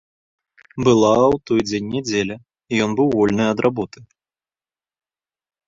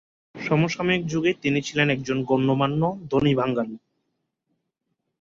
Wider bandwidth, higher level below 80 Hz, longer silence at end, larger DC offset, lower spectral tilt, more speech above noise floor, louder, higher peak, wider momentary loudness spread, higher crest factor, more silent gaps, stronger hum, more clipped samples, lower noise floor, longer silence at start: about the same, 7.8 kHz vs 7.6 kHz; about the same, -52 dBFS vs -56 dBFS; first, 1.65 s vs 1.45 s; neither; about the same, -5.5 dB/octave vs -6 dB/octave; first, over 72 dB vs 55 dB; first, -18 LUFS vs -23 LUFS; first, -2 dBFS vs -6 dBFS; first, 13 LU vs 5 LU; about the same, 18 dB vs 18 dB; neither; neither; neither; first, under -90 dBFS vs -78 dBFS; first, 0.75 s vs 0.35 s